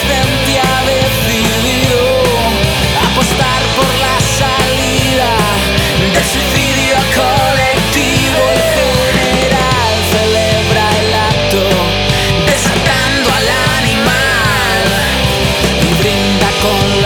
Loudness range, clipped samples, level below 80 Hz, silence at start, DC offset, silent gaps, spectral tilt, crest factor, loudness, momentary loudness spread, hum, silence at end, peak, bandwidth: 0 LU; under 0.1%; -24 dBFS; 0 s; under 0.1%; none; -4 dB/octave; 10 dB; -10 LUFS; 1 LU; none; 0 s; 0 dBFS; over 20 kHz